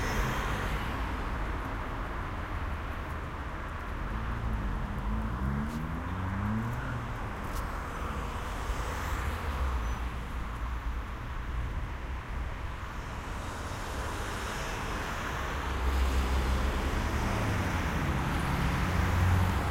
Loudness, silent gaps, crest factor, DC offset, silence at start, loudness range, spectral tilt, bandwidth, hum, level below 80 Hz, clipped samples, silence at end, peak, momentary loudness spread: -34 LUFS; none; 16 dB; under 0.1%; 0 s; 7 LU; -5.5 dB/octave; 16 kHz; none; -36 dBFS; under 0.1%; 0 s; -16 dBFS; 8 LU